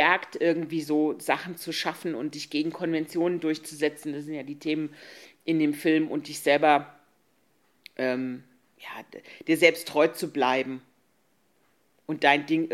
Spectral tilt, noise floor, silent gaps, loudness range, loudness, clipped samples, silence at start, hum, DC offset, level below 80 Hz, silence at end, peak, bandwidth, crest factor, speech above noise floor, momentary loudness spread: -4.5 dB/octave; -69 dBFS; none; 3 LU; -26 LUFS; under 0.1%; 0 s; none; under 0.1%; -80 dBFS; 0 s; -4 dBFS; 15 kHz; 24 dB; 43 dB; 20 LU